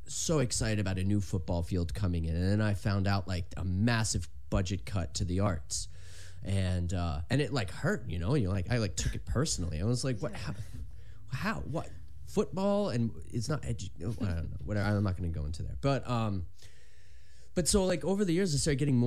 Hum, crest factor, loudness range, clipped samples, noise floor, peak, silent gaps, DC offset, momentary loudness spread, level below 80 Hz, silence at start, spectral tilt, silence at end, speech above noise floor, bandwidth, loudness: none; 18 dB; 3 LU; under 0.1%; -58 dBFS; -14 dBFS; none; 0.9%; 10 LU; -44 dBFS; 0 s; -5.5 dB/octave; 0 s; 26 dB; 14 kHz; -32 LUFS